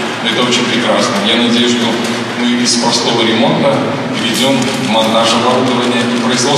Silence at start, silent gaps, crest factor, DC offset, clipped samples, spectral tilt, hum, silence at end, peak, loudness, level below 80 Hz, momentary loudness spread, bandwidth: 0 s; none; 12 dB; under 0.1%; under 0.1%; -3.5 dB/octave; none; 0 s; 0 dBFS; -11 LUFS; -58 dBFS; 4 LU; 14 kHz